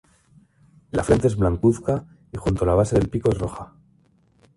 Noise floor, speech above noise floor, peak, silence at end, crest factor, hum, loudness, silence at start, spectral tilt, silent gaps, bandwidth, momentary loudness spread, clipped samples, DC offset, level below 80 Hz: -60 dBFS; 39 dB; -4 dBFS; 0.9 s; 18 dB; none; -22 LUFS; 0.95 s; -7.5 dB/octave; none; 11.5 kHz; 12 LU; under 0.1%; under 0.1%; -36 dBFS